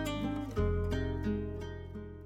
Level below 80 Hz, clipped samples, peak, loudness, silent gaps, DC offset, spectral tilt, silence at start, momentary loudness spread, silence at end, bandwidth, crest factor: -42 dBFS; under 0.1%; -22 dBFS; -36 LUFS; none; under 0.1%; -7 dB/octave; 0 s; 10 LU; 0 s; 14.5 kHz; 14 dB